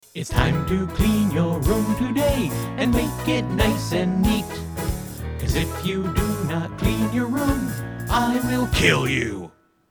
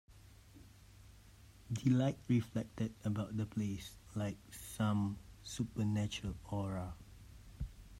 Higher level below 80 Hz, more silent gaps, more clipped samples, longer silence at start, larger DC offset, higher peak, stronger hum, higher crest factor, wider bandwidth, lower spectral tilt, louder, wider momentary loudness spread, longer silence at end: first, -32 dBFS vs -58 dBFS; neither; neither; about the same, 0.15 s vs 0.1 s; neither; first, -2 dBFS vs -22 dBFS; neither; about the same, 20 dB vs 18 dB; first, over 20 kHz vs 16 kHz; about the same, -5.5 dB/octave vs -6.5 dB/octave; first, -22 LUFS vs -39 LUFS; second, 8 LU vs 18 LU; first, 0.4 s vs 0 s